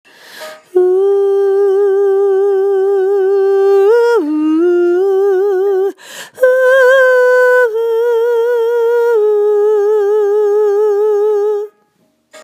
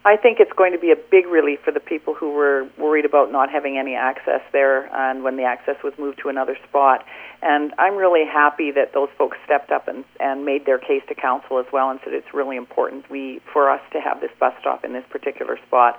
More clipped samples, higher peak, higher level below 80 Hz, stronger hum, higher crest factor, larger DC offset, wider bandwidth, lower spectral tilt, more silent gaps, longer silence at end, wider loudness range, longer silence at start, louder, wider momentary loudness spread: neither; about the same, 0 dBFS vs 0 dBFS; second, -80 dBFS vs -70 dBFS; neither; second, 10 dB vs 20 dB; neither; first, 15 kHz vs 3.6 kHz; second, -3 dB/octave vs -5.5 dB/octave; neither; about the same, 0.05 s vs 0 s; second, 2 LU vs 5 LU; first, 0.35 s vs 0.05 s; first, -11 LUFS vs -20 LUFS; second, 6 LU vs 11 LU